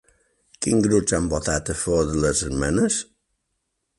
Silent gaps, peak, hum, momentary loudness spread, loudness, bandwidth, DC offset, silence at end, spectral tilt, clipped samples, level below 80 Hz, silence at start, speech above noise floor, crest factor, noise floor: none; -6 dBFS; none; 6 LU; -22 LUFS; 11.5 kHz; under 0.1%; 0.95 s; -4.5 dB/octave; under 0.1%; -38 dBFS; 0.6 s; 55 dB; 18 dB; -76 dBFS